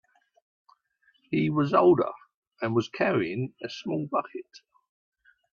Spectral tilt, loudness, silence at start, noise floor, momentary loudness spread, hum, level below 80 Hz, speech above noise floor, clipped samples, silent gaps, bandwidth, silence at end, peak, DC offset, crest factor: -7.5 dB/octave; -27 LUFS; 1.3 s; -68 dBFS; 15 LU; none; -68 dBFS; 42 dB; under 0.1%; 2.34-2.42 s; 6.8 kHz; 0.95 s; -8 dBFS; under 0.1%; 20 dB